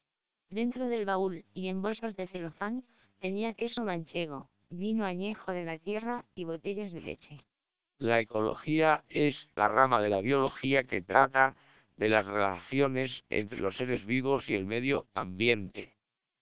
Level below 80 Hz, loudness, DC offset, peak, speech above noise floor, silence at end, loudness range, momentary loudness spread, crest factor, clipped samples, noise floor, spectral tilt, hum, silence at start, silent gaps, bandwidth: -64 dBFS; -31 LUFS; 0.2%; -8 dBFS; 57 dB; 0.55 s; 9 LU; 13 LU; 24 dB; under 0.1%; -88 dBFS; -4 dB/octave; none; 0.5 s; none; 4 kHz